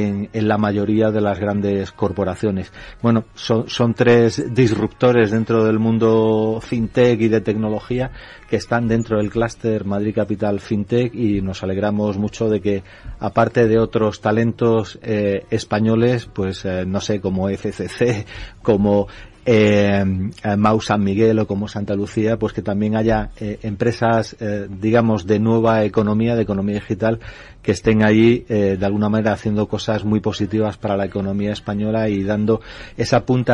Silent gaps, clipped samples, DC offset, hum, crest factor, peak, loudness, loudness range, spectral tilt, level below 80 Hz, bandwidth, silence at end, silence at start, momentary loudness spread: none; under 0.1%; under 0.1%; none; 16 dB; -2 dBFS; -19 LUFS; 4 LU; -7 dB/octave; -42 dBFS; 10.5 kHz; 0 s; 0 s; 8 LU